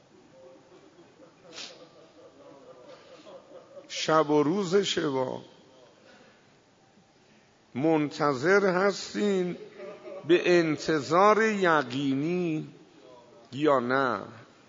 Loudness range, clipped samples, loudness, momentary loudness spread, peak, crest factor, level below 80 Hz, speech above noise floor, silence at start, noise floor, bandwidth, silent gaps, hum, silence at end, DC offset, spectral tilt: 8 LU; under 0.1%; -26 LUFS; 20 LU; -8 dBFS; 20 dB; -74 dBFS; 35 dB; 0.45 s; -60 dBFS; 7.8 kHz; none; none; 0.25 s; under 0.1%; -5 dB/octave